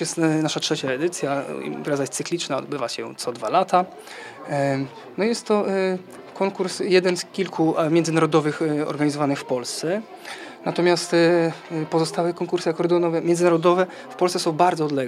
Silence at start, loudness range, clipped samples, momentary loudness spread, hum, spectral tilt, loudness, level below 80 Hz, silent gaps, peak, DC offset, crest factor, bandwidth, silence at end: 0 s; 4 LU; under 0.1%; 10 LU; none; -5 dB/octave; -22 LUFS; -76 dBFS; none; -4 dBFS; under 0.1%; 18 dB; 14 kHz; 0 s